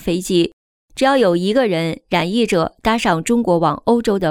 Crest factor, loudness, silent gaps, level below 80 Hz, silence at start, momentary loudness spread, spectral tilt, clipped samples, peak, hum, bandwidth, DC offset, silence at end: 14 dB; -17 LUFS; 0.53-0.88 s; -44 dBFS; 0 s; 5 LU; -5.5 dB/octave; under 0.1%; -2 dBFS; none; 16.5 kHz; under 0.1%; 0 s